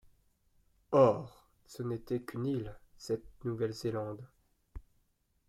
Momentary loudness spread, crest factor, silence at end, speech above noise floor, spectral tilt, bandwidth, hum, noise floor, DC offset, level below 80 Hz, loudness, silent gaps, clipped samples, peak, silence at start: 22 LU; 22 dB; 0.7 s; 42 dB; -7.5 dB/octave; 14 kHz; none; -75 dBFS; under 0.1%; -60 dBFS; -34 LUFS; none; under 0.1%; -14 dBFS; 0.9 s